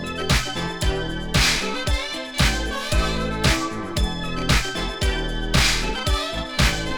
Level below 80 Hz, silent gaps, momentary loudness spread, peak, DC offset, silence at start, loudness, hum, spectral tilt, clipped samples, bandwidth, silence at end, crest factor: -28 dBFS; none; 7 LU; -4 dBFS; under 0.1%; 0 s; -22 LUFS; none; -3.5 dB/octave; under 0.1%; over 20 kHz; 0 s; 18 dB